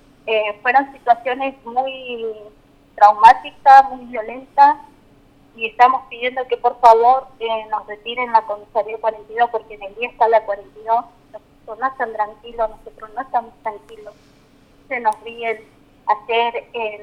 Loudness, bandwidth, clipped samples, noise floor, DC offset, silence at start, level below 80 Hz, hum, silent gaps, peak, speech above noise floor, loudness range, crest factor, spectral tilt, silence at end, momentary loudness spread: -17 LUFS; 10.5 kHz; under 0.1%; -51 dBFS; under 0.1%; 0.25 s; -54 dBFS; none; none; 0 dBFS; 34 dB; 12 LU; 18 dB; -3.5 dB/octave; 0 s; 17 LU